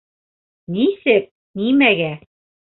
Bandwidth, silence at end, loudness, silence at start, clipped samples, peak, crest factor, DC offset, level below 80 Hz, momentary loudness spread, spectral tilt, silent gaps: 4.2 kHz; 0.6 s; -17 LUFS; 0.7 s; under 0.1%; -2 dBFS; 18 dB; under 0.1%; -62 dBFS; 15 LU; -10.5 dB/octave; 1.31-1.54 s